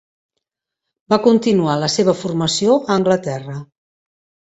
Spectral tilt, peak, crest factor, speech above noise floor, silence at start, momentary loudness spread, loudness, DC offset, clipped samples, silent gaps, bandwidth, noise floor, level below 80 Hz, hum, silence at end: -5 dB/octave; 0 dBFS; 18 dB; 66 dB; 1.1 s; 12 LU; -16 LUFS; under 0.1%; under 0.1%; none; 8.2 kHz; -82 dBFS; -58 dBFS; none; 0.9 s